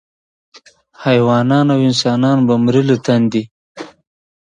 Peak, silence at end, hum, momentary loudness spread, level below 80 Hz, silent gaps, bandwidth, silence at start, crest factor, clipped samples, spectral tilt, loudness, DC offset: 0 dBFS; 0.65 s; none; 21 LU; -56 dBFS; 3.51-3.75 s; 9.2 kHz; 1 s; 16 dB; under 0.1%; -6.5 dB/octave; -14 LUFS; under 0.1%